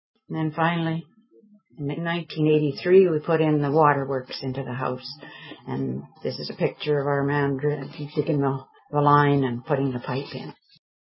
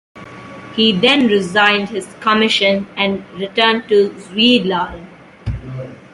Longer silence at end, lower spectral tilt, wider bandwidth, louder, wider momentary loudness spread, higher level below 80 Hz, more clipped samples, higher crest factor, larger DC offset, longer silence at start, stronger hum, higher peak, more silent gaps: first, 0.5 s vs 0.15 s; first, -11 dB/octave vs -5 dB/octave; second, 5.8 kHz vs 11.5 kHz; second, -24 LUFS vs -14 LUFS; second, 15 LU vs 18 LU; second, -62 dBFS vs -42 dBFS; neither; about the same, 20 dB vs 16 dB; neither; first, 0.3 s vs 0.15 s; neither; second, -4 dBFS vs 0 dBFS; neither